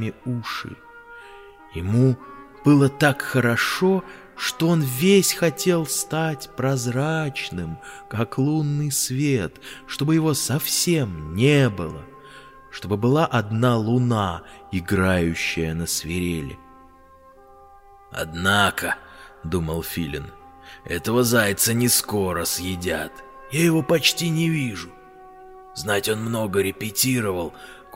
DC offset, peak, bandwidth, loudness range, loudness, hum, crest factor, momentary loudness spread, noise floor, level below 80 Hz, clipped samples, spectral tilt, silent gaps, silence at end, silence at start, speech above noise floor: under 0.1%; -2 dBFS; 16.5 kHz; 5 LU; -22 LUFS; none; 20 dB; 17 LU; -50 dBFS; -48 dBFS; under 0.1%; -4.5 dB/octave; none; 0 s; 0 s; 28 dB